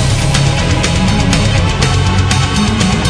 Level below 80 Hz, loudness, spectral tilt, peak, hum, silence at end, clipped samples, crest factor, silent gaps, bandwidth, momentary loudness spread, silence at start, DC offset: -20 dBFS; -12 LUFS; -4.5 dB/octave; 0 dBFS; none; 0 s; under 0.1%; 12 dB; none; 11 kHz; 1 LU; 0 s; under 0.1%